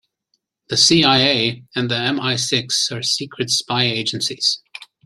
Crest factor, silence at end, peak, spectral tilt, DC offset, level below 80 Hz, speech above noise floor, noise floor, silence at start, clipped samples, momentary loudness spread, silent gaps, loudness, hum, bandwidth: 20 dB; 0.2 s; 0 dBFS; -3 dB/octave; under 0.1%; -58 dBFS; 52 dB; -70 dBFS; 0.7 s; under 0.1%; 9 LU; none; -17 LUFS; none; 14 kHz